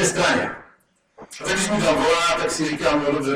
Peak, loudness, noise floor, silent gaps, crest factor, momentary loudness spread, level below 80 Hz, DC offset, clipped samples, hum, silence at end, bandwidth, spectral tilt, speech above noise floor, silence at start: -6 dBFS; -20 LUFS; -58 dBFS; none; 16 dB; 12 LU; -48 dBFS; under 0.1%; under 0.1%; none; 0 s; 16.5 kHz; -3.5 dB/octave; 38 dB; 0 s